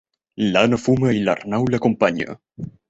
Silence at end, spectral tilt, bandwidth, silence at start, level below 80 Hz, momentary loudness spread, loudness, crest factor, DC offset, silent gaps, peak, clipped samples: 0.2 s; -6.5 dB/octave; 8.2 kHz; 0.4 s; -50 dBFS; 12 LU; -19 LUFS; 18 dB; under 0.1%; none; -2 dBFS; under 0.1%